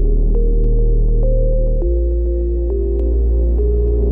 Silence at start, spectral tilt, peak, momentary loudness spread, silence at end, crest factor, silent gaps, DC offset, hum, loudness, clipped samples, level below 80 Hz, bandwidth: 0 s; -14 dB/octave; -6 dBFS; 2 LU; 0 s; 8 dB; none; under 0.1%; none; -18 LUFS; under 0.1%; -14 dBFS; 1.1 kHz